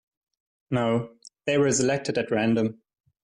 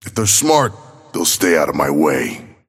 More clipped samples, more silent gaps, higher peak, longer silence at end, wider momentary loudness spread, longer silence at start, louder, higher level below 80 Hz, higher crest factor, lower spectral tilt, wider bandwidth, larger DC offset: neither; neither; second, -12 dBFS vs 0 dBFS; first, 0.5 s vs 0.2 s; about the same, 8 LU vs 10 LU; first, 0.7 s vs 0.05 s; second, -25 LUFS vs -15 LUFS; second, -62 dBFS vs -50 dBFS; about the same, 14 dB vs 16 dB; first, -5 dB/octave vs -3 dB/octave; second, 11 kHz vs 16.5 kHz; neither